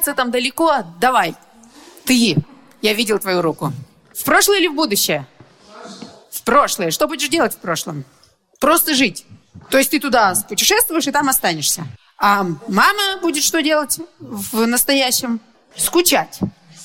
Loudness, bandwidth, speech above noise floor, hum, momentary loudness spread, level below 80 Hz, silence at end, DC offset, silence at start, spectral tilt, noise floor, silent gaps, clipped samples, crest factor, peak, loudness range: -16 LUFS; 17 kHz; 27 dB; none; 13 LU; -52 dBFS; 0 s; under 0.1%; 0 s; -2.5 dB/octave; -44 dBFS; none; under 0.1%; 18 dB; 0 dBFS; 3 LU